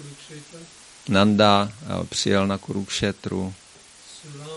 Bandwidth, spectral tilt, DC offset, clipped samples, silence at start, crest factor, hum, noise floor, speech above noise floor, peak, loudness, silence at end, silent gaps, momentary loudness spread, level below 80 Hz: 11.5 kHz; -5 dB/octave; under 0.1%; under 0.1%; 0 s; 22 dB; none; -48 dBFS; 25 dB; -2 dBFS; -22 LUFS; 0 s; none; 25 LU; -54 dBFS